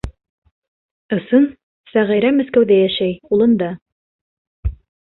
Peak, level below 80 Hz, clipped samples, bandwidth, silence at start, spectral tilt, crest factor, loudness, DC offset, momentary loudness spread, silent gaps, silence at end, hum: -2 dBFS; -36 dBFS; under 0.1%; 4.3 kHz; 0.05 s; -8.5 dB/octave; 16 dB; -16 LUFS; under 0.1%; 15 LU; 0.29-0.42 s, 0.51-0.62 s, 0.68-1.09 s, 1.63-1.84 s, 3.82-3.86 s, 3.92-4.63 s; 0.4 s; none